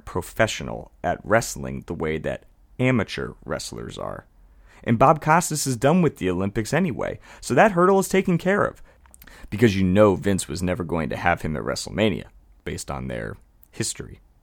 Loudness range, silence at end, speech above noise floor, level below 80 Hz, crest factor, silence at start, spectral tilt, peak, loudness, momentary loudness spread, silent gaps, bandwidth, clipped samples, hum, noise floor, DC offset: 7 LU; 0.3 s; 29 dB; -46 dBFS; 20 dB; 0.05 s; -5.5 dB/octave; -2 dBFS; -23 LUFS; 16 LU; none; 17.5 kHz; under 0.1%; none; -51 dBFS; under 0.1%